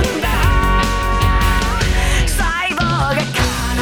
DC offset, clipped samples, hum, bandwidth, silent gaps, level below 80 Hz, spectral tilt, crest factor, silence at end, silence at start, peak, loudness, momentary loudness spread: under 0.1%; under 0.1%; none; 19 kHz; none; -18 dBFS; -4.5 dB/octave; 14 dB; 0 s; 0 s; -2 dBFS; -16 LUFS; 2 LU